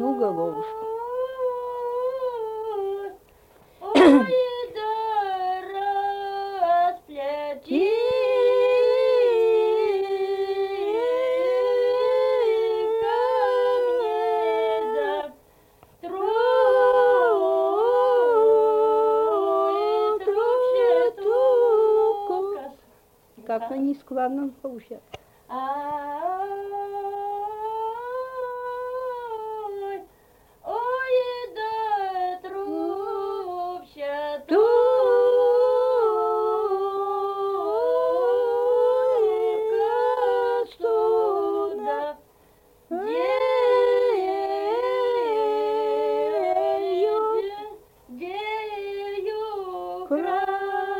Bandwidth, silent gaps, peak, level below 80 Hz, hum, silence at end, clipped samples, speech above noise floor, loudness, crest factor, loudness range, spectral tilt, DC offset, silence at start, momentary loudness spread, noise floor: 16 kHz; none; -4 dBFS; -64 dBFS; none; 0 s; under 0.1%; 29 dB; -23 LUFS; 18 dB; 10 LU; -5 dB/octave; under 0.1%; 0 s; 13 LU; -57 dBFS